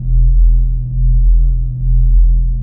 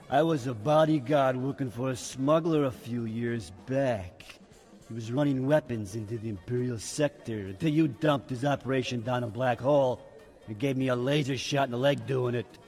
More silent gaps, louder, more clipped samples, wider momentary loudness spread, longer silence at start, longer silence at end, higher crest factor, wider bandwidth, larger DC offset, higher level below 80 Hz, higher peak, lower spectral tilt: neither; first, -15 LUFS vs -29 LUFS; neither; second, 4 LU vs 11 LU; about the same, 0 s vs 0 s; about the same, 0 s vs 0.1 s; second, 8 dB vs 16 dB; second, 0.6 kHz vs 14 kHz; neither; first, -10 dBFS vs -62 dBFS; first, -2 dBFS vs -12 dBFS; first, -15.5 dB/octave vs -6 dB/octave